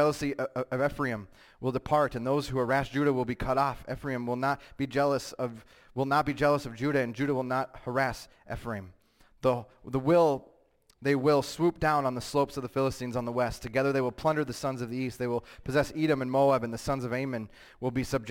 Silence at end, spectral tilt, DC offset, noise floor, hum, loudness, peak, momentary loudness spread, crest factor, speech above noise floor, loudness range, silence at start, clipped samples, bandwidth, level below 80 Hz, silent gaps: 0 s; -6 dB/octave; under 0.1%; -65 dBFS; none; -30 LUFS; -14 dBFS; 10 LU; 16 dB; 36 dB; 3 LU; 0 s; under 0.1%; 17 kHz; -52 dBFS; none